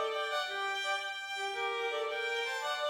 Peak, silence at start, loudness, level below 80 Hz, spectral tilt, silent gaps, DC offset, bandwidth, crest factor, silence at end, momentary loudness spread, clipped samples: -22 dBFS; 0 s; -34 LUFS; -82 dBFS; 1 dB/octave; none; under 0.1%; 16.5 kHz; 12 dB; 0 s; 2 LU; under 0.1%